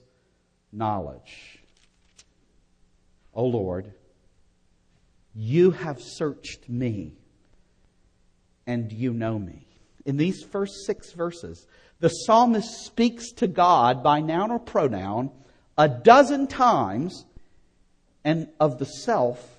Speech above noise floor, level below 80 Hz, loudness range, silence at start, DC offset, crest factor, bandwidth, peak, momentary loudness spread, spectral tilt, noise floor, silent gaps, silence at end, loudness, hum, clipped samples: 44 dB; -58 dBFS; 13 LU; 0.75 s; under 0.1%; 24 dB; 10 kHz; 0 dBFS; 17 LU; -6 dB/octave; -67 dBFS; none; 0.15 s; -23 LUFS; none; under 0.1%